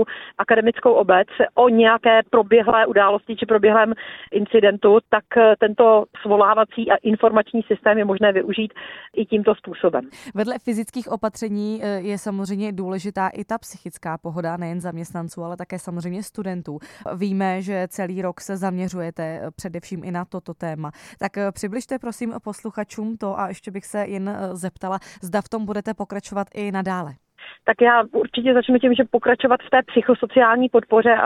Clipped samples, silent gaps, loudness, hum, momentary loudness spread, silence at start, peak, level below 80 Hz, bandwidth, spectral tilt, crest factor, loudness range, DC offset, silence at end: under 0.1%; none; -20 LUFS; none; 15 LU; 0 s; -2 dBFS; -60 dBFS; 13.5 kHz; -5.5 dB/octave; 18 dB; 13 LU; under 0.1%; 0 s